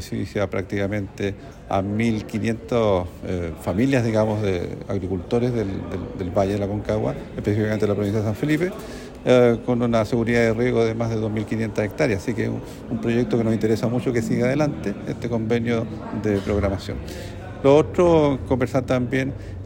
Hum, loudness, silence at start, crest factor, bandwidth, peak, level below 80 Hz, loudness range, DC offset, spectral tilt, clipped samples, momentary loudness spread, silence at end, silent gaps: none; -22 LUFS; 0 s; 18 dB; 16.5 kHz; -4 dBFS; -42 dBFS; 4 LU; under 0.1%; -7 dB/octave; under 0.1%; 10 LU; 0 s; none